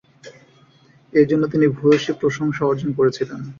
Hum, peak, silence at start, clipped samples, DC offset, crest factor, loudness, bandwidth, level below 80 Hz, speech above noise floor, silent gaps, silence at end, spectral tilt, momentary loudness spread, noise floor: none; -4 dBFS; 0.25 s; under 0.1%; under 0.1%; 16 dB; -19 LUFS; 7.4 kHz; -58 dBFS; 34 dB; none; 0.05 s; -7 dB/octave; 5 LU; -53 dBFS